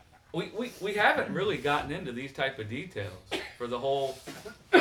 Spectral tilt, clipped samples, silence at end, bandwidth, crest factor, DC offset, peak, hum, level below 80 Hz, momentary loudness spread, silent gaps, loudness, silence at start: -5 dB/octave; under 0.1%; 0 s; 18.5 kHz; 24 dB; under 0.1%; -6 dBFS; none; -60 dBFS; 14 LU; none; -31 LUFS; 0.35 s